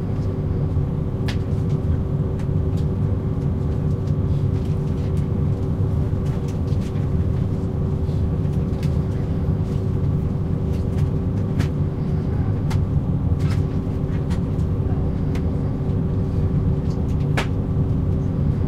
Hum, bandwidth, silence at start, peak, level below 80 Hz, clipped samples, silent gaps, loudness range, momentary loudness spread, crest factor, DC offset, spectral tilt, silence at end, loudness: none; 8.8 kHz; 0 s; -6 dBFS; -28 dBFS; under 0.1%; none; 1 LU; 2 LU; 16 dB; under 0.1%; -9 dB/octave; 0 s; -22 LUFS